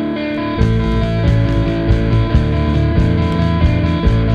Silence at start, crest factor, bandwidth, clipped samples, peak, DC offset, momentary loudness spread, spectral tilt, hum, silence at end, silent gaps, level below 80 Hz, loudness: 0 s; 14 dB; 7.2 kHz; under 0.1%; 0 dBFS; under 0.1%; 2 LU; -8.5 dB/octave; none; 0 s; none; -20 dBFS; -15 LUFS